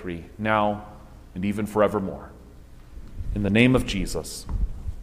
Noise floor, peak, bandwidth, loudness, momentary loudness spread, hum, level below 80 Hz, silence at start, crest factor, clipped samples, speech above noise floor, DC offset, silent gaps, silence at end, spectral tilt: -45 dBFS; -4 dBFS; 15.5 kHz; -25 LUFS; 21 LU; none; -36 dBFS; 0 s; 20 dB; under 0.1%; 21 dB; under 0.1%; none; 0 s; -6 dB/octave